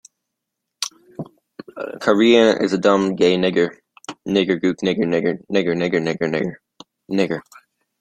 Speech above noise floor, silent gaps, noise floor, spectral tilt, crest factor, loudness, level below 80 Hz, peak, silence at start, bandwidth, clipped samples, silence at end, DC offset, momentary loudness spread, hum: 62 dB; none; -80 dBFS; -5.5 dB/octave; 18 dB; -19 LUFS; -60 dBFS; -2 dBFS; 0.8 s; 14.5 kHz; under 0.1%; 0.6 s; under 0.1%; 20 LU; none